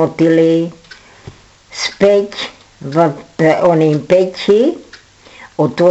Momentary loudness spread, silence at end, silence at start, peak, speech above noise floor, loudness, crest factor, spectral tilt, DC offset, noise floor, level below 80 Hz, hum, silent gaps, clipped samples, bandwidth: 14 LU; 0 s; 0 s; 0 dBFS; 29 dB; -13 LUFS; 14 dB; -6.5 dB/octave; under 0.1%; -41 dBFS; -52 dBFS; none; none; under 0.1%; 8.2 kHz